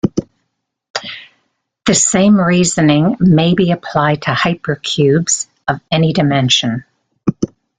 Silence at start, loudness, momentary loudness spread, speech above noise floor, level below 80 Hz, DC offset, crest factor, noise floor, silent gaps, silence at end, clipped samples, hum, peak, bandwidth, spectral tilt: 0.05 s; -13 LUFS; 13 LU; 59 dB; -46 dBFS; under 0.1%; 14 dB; -71 dBFS; 0.90-0.94 s; 0.35 s; under 0.1%; none; 0 dBFS; 9.6 kHz; -4.5 dB/octave